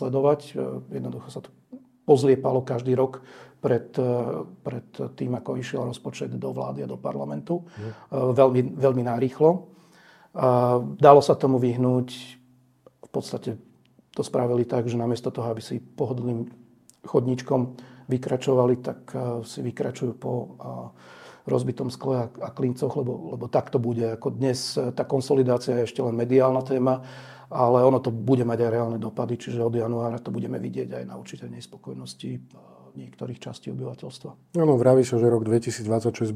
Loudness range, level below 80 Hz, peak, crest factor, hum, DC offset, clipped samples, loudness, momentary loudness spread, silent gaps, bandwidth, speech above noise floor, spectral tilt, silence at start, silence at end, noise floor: 9 LU; -68 dBFS; 0 dBFS; 24 dB; none; under 0.1%; under 0.1%; -24 LUFS; 18 LU; none; 13.5 kHz; 33 dB; -7.5 dB/octave; 0 s; 0 s; -57 dBFS